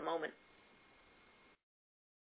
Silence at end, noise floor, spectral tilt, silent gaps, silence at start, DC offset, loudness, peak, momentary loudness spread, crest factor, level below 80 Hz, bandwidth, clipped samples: 1.9 s; -67 dBFS; -1.5 dB/octave; none; 0 s; under 0.1%; -44 LUFS; -26 dBFS; 24 LU; 24 dB; -84 dBFS; 4 kHz; under 0.1%